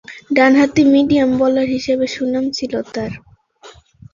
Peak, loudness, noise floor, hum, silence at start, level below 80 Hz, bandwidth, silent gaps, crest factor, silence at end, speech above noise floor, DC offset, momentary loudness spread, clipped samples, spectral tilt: -2 dBFS; -15 LUFS; -43 dBFS; none; 0.1 s; -50 dBFS; 7.4 kHz; none; 14 dB; 0.45 s; 29 dB; under 0.1%; 13 LU; under 0.1%; -5.5 dB/octave